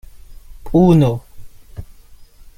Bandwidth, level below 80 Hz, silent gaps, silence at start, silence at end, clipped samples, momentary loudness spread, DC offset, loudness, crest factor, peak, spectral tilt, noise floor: 15 kHz; -36 dBFS; none; 0.3 s; 0.45 s; under 0.1%; 26 LU; under 0.1%; -14 LUFS; 16 dB; -2 dBFS; -9 dB/octave; -41 dBFS